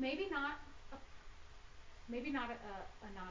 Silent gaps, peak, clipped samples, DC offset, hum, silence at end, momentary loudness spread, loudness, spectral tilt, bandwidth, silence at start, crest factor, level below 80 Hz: none; -28 dBFS; under 0.1%; under 0.1%; none; 0 s; 21 LU; -44 LUFS; -5 dB/octave; 7.6 kHz; 0 s; 18 dB; -60 dBFS